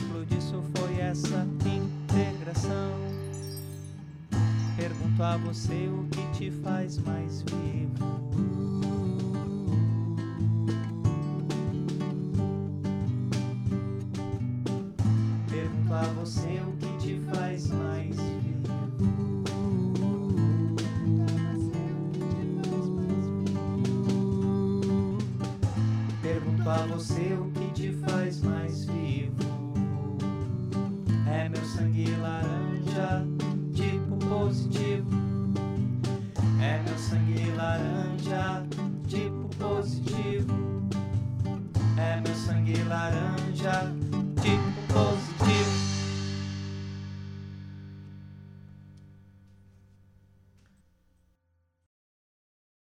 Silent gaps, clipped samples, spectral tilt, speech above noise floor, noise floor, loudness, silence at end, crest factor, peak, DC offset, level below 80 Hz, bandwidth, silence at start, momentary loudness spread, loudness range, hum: none; under 0.1%; -7 dB/octave; 43 dB; -73 dBFS; -30 LUFS; 3.6 s; 18 dB; -10 dBFS; under 0.1%; -52 dBFS; 11.5 kHz; 0 s; 6 LU; 3 LU; none